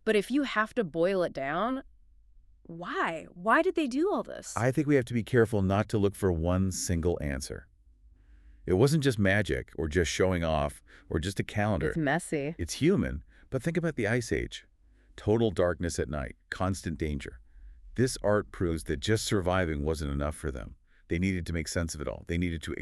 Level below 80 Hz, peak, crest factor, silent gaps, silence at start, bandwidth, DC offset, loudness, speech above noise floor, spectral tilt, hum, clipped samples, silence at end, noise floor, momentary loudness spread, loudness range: -46 dBFS; -10 dBFS; 18 dB; none; 0.05 s; 13.5 kHz; under 0.1%; -30 LUFS; 30 dB; -5.5 dB/octave; none; under 0.1%; 0 s; -59 dBFS; 11 LU; 4 LU